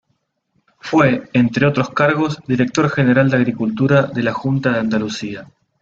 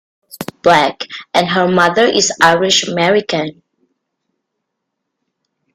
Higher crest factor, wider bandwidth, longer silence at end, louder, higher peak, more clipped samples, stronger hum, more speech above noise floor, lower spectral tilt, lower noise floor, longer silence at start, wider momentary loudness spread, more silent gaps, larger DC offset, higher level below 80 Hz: about the same, 16 dB vs 16 dB; second, 7.6 kHz vs 16 kHz; second, 0.35 s vs 2.25 s; second, -16 LUFS vs -12 LUFS; about the same, 0 dBFS vs 0 dBFS; neither; neither; second, 52 dB vs 62 dB; first, -7 dB/octave vs -3 dB/octave; second, -68 dBFS vs -75 dBFS; first, 0.85 s vs 0.35 s; second, 7 LU vs 13 LU; neither; neither; about the same, -52 dBFS vs -54 dBFS